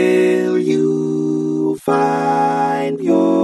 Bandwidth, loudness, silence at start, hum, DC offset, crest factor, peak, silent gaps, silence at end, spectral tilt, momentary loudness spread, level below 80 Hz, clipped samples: 12 kHz; -16 LUFS; 0 s; none; under 0.1%; 12 dB; -2 dBFS; none; 0 s; -7 dB/octave; 4 LU; -66 dBFS; under 0.1%